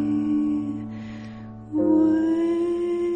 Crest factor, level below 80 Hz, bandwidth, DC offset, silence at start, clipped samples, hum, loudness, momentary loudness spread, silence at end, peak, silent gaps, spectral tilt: 14 dB; -54 dBFS; 8.6 kHz; under 0.1%; 0 s; under 0.1%; none; -23 LUFS; 17 LU; 0 s; -10 dBFS; none; -8.5 dB/octave